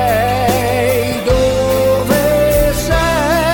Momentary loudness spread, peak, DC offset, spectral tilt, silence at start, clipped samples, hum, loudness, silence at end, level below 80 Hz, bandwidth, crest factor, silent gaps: 2 LU; -2 dBFS; 0.2%; -5 dB/octave; 0 s; under 0.1%; none; -13 LUFS; 0 s; -24 dBFS; 19 kHz; 12 dB; none